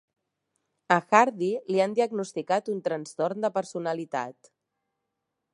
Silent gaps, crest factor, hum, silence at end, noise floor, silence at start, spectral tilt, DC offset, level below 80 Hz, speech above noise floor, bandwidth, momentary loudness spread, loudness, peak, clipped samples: none; 24 dB; none; 1.2 s; -83 dBFS; 0.9 s; -5 dB/octave; under 0.1%; -82 dBFS; 56 dB; 11.5 kHz; 11 LU; -27 LUFS; -4 dBFS; under 0.1%